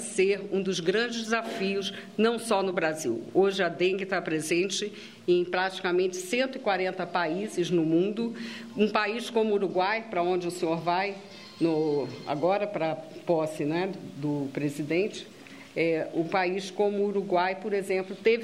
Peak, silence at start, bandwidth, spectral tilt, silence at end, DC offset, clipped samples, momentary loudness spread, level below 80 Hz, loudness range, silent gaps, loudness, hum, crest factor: -8 dBFS; 0 s; 14 kHz; -5 dB/octave; 0 s; under 0.1%; under 0.1%; 7 LU; -76 dBFS; 2 LU; none; -28 LUFS; none; 20 dB